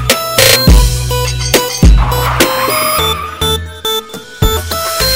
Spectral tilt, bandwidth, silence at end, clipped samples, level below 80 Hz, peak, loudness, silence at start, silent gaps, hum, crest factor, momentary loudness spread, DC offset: -3.5 dB/octave; 16.5 kHz; 0 s; 0.3%; -14 dBFS; 0 dBFS; -11 LUFS; 0 s; none; none; 10 dB; 9 LU; under 0.1%